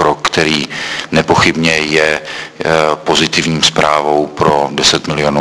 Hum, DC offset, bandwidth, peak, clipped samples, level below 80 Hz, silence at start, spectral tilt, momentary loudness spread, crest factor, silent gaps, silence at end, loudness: none; under 0.1%; 11 kHz; 0 dBFS; 0.4%; -40 dBFS; 0 s; -3.5 dB/octave; 6 LU; 12 dB; none; 0 s; -12 LUFS